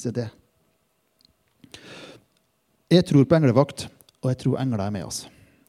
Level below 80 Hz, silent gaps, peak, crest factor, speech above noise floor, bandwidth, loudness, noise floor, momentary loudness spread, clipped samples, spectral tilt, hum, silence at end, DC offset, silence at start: -60 dBFS; none; -2 dBFS; 22 dB; 48 dB; 14 kHz; -22 LUFS; -69 dBFS; 23 LU; under 0.1%; -6.5 dB/octave; none; 0.4 s; under 0.1%; 0 s